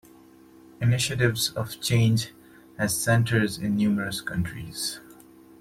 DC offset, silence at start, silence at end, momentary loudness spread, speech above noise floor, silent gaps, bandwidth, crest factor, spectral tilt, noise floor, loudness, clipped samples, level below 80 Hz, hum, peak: under 0.1%; 0.8 s; 0.45 s; 9 LU; 27 dB; none; 16 kHz; 18 dB; -4.5 dB/octave; -52 dBFS; -25 LUFS; under 0.1%; -54 dBFS; none; -8 dBFS